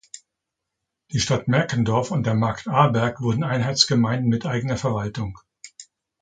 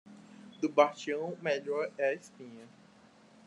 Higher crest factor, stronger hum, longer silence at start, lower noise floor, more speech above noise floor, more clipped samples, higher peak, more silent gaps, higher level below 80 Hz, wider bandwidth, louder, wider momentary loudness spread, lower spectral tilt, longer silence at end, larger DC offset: about the same, 22 dB vs 24 dB; neither; first, 1.1 s vs 0.05 s; first, -82 dBFS vs -60 dBFS; first, 61 dB vs 28 dB; neither; first, -2 dBFS vs -10 dBFS; neither; first, -50 dBFS vs -88 dBFS; second, 9.4 kHz vs 10.5 kHz; first, -22 LUFS vs -32 LUFS; second, 16 LU vs 24 LU; about the same, -5 dB/octave vs -5 dB/octave; second, 0.4 s vs 0.8 s; neither